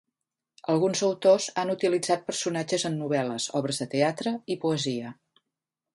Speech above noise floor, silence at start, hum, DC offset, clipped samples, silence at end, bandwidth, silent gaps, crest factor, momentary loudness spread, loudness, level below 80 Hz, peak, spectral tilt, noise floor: 60 dB; 0.7 s; none; under 0.1%; under 0.1%; 0.85 s; 11.5 kHz; none; 18 dB; 8 LU; -27 LUFS; -74 dBFS; -8 dBFS; -4.5 dB/octave; -87 dBFS